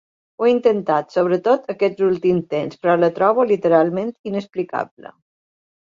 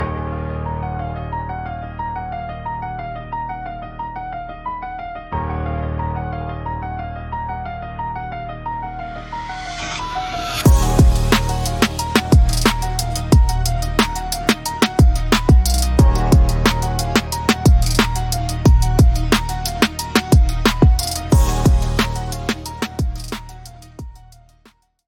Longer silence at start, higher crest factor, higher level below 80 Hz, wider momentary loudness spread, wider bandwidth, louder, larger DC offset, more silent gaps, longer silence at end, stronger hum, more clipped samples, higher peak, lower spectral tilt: first, 0.4 s vs 0 s; about the same, 16 dB vs 18 dB; second, -64 dBFS vs -20 dBFS; second, 10 LU vs 14 LU; second, 7.4 kHz vs 17.5 kHz; about the same, -19 LUFS vs -19 LUFS; neither; first, 4.19-4.24 s vs none; first, 1.05 s vs 0.85 s; neither; neither; about the same, -2 dBFS vs 0 dBFS; first, -8 dB/octave vs -5 dB/octave